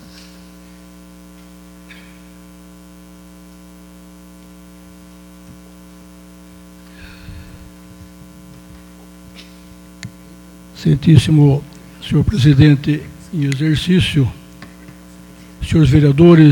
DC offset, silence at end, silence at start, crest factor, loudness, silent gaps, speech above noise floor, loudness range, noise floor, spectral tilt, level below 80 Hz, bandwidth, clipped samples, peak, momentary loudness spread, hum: under 0.1%; 0 s; 7 s; 18 dB; -13 LUFS; none; 29 dB; 25 LU; -40 dBFS; -7.5 dB/octave; -38 dBFS; 17.5 kHz; under 0.1%; 0 dBFS; 28 LU; 60 Hz at -40 dBFS